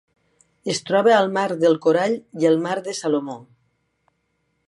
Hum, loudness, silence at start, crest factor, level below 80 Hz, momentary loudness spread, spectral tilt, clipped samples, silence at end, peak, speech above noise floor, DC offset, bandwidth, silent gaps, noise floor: none; -20 LUFS; 0.65 s; 18 dB; -74 dBFS; 10 LU; -5 dB/octave; under 0.1%; 1.25 s; -4 dBFS; 51 dB; under 0.1%; 11.5 kHz; none; -71 dBFS